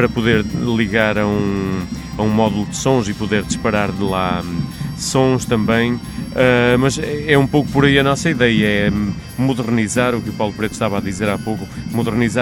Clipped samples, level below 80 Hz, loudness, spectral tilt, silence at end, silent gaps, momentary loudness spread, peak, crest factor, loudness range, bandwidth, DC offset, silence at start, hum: under 0.1%; -36 dBFS; -17 LUFS; -5.5 dB/octave; 0 s; none; 9 LU; 0 dBFS; 16 dB; 4 LU; 17.5 kHz; under 0.1%; 0 s; none